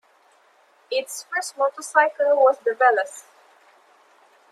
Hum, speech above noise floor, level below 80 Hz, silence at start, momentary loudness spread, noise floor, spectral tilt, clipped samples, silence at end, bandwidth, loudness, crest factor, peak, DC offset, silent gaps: none; 37 dB; -90 dBFS; 0.9 s; 10 LU; -58 dBFS; 0.5 dB/octave; under 0.1%; 1.3 s; 14.5 kHz; -21 LUFS; 20 dB; -4 dBFS; under 0.1%; none